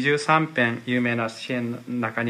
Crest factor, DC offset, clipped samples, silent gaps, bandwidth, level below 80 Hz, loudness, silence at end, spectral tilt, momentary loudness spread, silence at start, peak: 18 dB; under 0.1%; under 0.1%; none; 11.5 kHz; -70 dBFS; -24 LUFS; 0 s; -5.5 dB/octave; 9 LU; 0 s; -4 dBFS